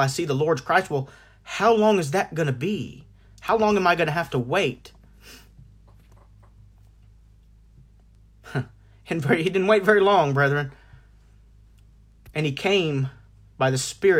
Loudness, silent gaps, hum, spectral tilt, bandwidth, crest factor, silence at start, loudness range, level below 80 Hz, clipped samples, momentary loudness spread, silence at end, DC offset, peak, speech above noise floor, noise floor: -22 LUFS; none; none; -5.5 dB/octave; 16 kHz; 20 dB; 0 s; 10 LU; -54 dBFS; under 0.1%; 14 LU; 0 s; under 0.1%; -4 dBFS; 31 dB; -53 dBFS